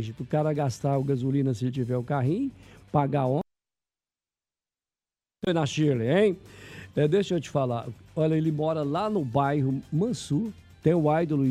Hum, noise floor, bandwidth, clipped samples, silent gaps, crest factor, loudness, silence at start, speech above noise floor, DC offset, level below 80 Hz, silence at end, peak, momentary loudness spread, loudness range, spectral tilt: none; under -90 dBFS; 11.5 kHz; under 0.1%; none; 18 dB; -27 LUFS; 0 s; over 64 dB; under 0.1%; -60 dBFS; 0 s; -8 dBFS; 9 LU; 4 LU; -7.5 dB/octave